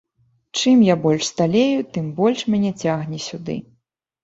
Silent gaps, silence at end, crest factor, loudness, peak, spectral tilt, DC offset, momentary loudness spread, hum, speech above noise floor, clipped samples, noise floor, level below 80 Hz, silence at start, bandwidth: none; 0.6 s; 18 dB; -19 LUFS; -2 dBFS; -5.5 dB/octave; under 0.1%; 14 LU; none; 49 dB; under 0.1%; -67 dBFS; -58 dBFS; 0.55 s; 8 kHz